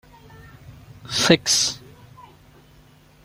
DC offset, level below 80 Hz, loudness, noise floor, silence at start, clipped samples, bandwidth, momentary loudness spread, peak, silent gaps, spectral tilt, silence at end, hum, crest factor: under 0.1%; -54 dBFS; -18 LUFS; -52 dBFS; 0.7 s; under 0.1%; 16.5 kHz; 22 LU; -2 dBFS; none; -2.5 dB/octave; 1.45 s; none; 24 dB